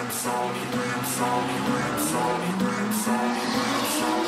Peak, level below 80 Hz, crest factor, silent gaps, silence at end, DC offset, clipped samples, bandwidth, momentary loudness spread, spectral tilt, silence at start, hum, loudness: -10 dBFS; -60 dBFS; 14 dB; none; 0 s; under 0.1%; under 0.1%; 16 kHz; 3 LU; -3.5 dB/octave; 0 s; none; -25 LUFS